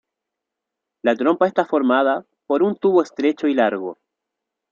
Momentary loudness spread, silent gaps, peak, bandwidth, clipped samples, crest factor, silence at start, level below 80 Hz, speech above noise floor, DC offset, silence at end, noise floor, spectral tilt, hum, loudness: 7 LU; none; -4 dBFS; 7.4 kHz; under 0.1%; 18 dB; 1.05 s; -72 dBFS; 65 dB; under 0.1%; 0.8 s; -83 dBFS; -6.5 dB/octave; none; -19 LUFS